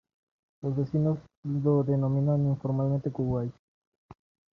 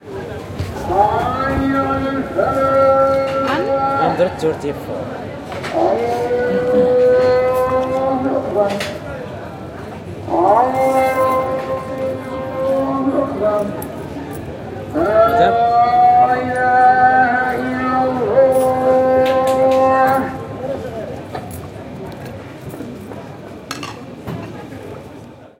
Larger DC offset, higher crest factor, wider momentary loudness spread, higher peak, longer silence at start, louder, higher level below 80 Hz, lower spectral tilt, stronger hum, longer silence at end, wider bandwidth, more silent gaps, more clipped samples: neither; about the same, 14 dB vs 16 dB; second, 8 LU vs 18 LU; second, -14 dBFS vs 0 dBFS; first, 0.65 s vs 0.05 s; second, -28 LUFS vs -16 LUFS; second, -58 dBFS vs -44 dBFS; first, -12 dB/octave vs -6.5 dB/octave; neither; first, 0.4 s vs 0.15 s; second, 2.1 kHz vs 16.5 kHz; first, 1.37-1.43 s, 3.59-4.09 s vs none; neither